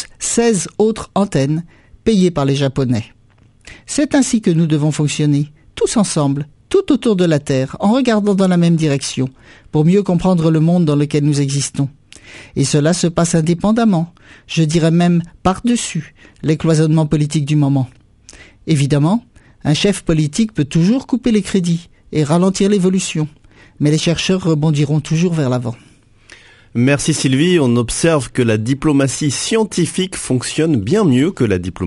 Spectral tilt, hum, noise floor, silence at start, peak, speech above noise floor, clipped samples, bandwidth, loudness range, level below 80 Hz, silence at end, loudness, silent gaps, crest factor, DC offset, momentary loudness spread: -6 dB/octave; none; -49 dBFS; 0 s; 0 dBFS; 35 dB; under 0.1%; 11.5 kHz; 2 LU; -42 dBFS; 0 s; -15 LUFS; none; 16 dB; under 0.1%; 8 LU